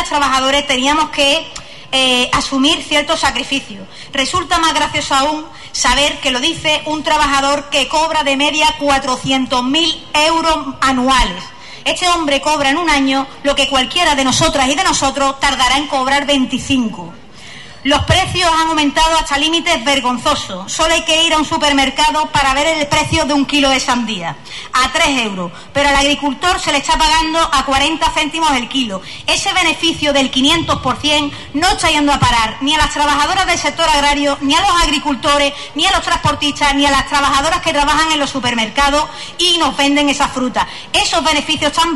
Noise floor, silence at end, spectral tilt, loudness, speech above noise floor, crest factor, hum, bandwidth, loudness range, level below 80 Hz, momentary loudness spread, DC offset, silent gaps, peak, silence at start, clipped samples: -35 dBFS; 0 s; -2.5 dB/octave; -13 LUFS; 21 dB; 14 dB; none; 12 kHz; 2 LU; -32 dBFS; 6 LU; 1%; none; 0 dBFS; 0 s; under 0.1%